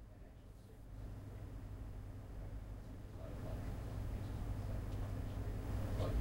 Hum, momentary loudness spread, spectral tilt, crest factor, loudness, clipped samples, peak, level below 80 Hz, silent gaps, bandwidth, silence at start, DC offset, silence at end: none; 13 LU; -7.5 dB/octave; 16 dB; -47 LUFS; under 0.1%; -28 dBFS; -48 dBFS; none; 16 kHz; 0 s; under 0.1%; 0 s